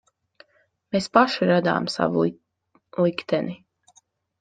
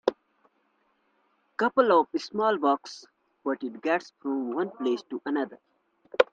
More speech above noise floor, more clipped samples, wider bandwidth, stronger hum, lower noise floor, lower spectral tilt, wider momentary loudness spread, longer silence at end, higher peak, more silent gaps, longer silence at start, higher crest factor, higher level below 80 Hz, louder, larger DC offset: about the same, 44 dB vs 44 dB; neither; about the same, 9.4 kHz vs 9 kHz; neither; second, -65 dBFS vs -71 dBFS; about the same, -6 dB/octave vs -5 dB/octave; second, 11 LU vs 14 LU; first, 0.85 s vs 0.1 s; about the same, -2 dBFS vs -4 dBFS; neither; first, 0.95 s vs 0.05 s; about the same, 24 dB vs 24 dB; first, -66 dBFS vs -78 dBFS; first, -23 LUFS vs -28 LUFS; neither